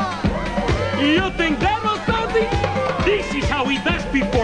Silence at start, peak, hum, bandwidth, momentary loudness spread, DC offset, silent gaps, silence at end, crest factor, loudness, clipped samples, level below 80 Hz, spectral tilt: 0 s; -4 dBFS; none; 10.5 kHz; 4 LU; 0.3%; none; 0 s; 14 dB; -20 LUFS; under 0.1%; -30 dBFS; -5.5 dB/octave